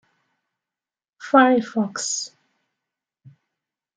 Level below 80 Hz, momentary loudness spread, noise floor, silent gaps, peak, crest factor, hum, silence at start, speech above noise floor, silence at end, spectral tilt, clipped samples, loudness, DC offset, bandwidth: -74 dBFS; 17 LU; under -90 dBFS; none; -2 dBFS; 22 dB; none; 1.2 s; over 71 dB; 1.7 s; -3.5 dB/octave; under 0.1%; -20 LUFS; under 0.1%; 9.6 kHz